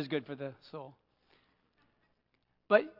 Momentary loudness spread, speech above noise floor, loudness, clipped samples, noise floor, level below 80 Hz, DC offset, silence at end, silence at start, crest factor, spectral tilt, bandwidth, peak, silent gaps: 19 LU; 44 dB; -34 LUFS; under 0.1%; -78 dBFS; -84 dBFS; under 0.1%; 0.1 s; 0 s; 28 dB; -3.5 dB/octave; 5.8 kHz; -10 dBFS; none